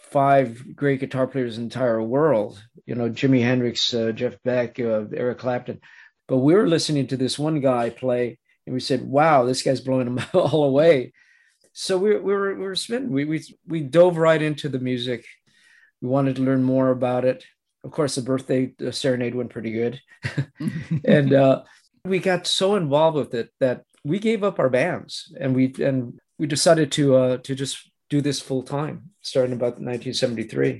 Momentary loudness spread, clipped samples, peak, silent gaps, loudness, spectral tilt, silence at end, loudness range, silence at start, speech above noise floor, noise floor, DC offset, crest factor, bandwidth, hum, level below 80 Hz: 12 LU; under 0.1%; -2 dBFS; none; -22 LUFS; -5.5 dB/octave; 0 s; 3 LU; 0.1 s; 38 dB; -59 dBFS; under 0.1%; 20 dB; 12.5 kHz; none; -64 dBFS